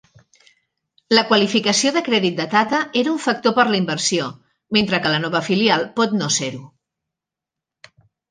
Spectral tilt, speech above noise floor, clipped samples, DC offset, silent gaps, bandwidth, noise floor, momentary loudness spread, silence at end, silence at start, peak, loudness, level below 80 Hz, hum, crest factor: -3.5 dB/octave; 68 dB; under 0.1%; under 0.1%; none; 10 kHz; -86 dBFS; 4 LU; 1.65 s; 1.1 s; -2 dBFS; -18 LUFS; -62 dBFS; none; 20 dB